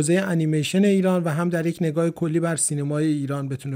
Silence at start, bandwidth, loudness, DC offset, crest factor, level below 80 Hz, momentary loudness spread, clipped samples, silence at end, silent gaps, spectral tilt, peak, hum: 0 s; 16 kHz; -22 LUFS; under 0.1%; 14 dB; -64 dBFS; 5 LU; under 0.1%; 0 s; none; -5.5 dB/octave; -8 dBFS; none